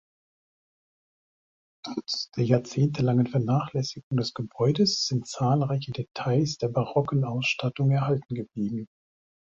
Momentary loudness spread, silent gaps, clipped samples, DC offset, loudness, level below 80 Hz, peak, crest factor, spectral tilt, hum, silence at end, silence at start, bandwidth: 9 LU; 4.03-4.11 s; under 0.1%; under 0.1%; -27 LUFS; -62 dBFS; -8 dBFS; 20 dB; -6 dB/octave; none; 0.7 s; 1.85 s; 7.8 kHz